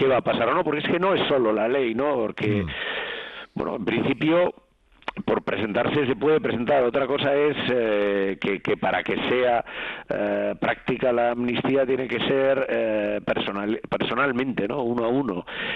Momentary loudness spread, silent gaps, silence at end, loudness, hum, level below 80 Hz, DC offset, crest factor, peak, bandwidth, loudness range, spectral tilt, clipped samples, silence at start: 7 LU; none; 0 s; -24 LUFS; none; -54 dBFS; under 0.1%; 12 dB; -12 dBFS; 6.2 kHz; 3 LU; -8 dB/octave; under 0.1%; 0 s